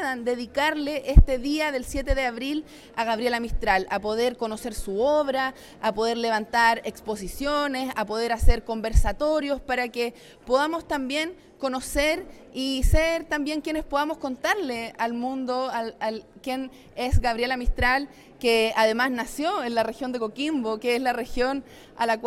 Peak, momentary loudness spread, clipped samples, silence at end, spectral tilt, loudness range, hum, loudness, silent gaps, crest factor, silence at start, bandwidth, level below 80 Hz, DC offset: -4 dBFS; 10 LU; under 0.1%; 0 s; -5 dB/octave; 3 LU; none; -26 LUFS; none; 22 dB; 0 s; 15.5 kHz; -30 dBFS; under 0.1%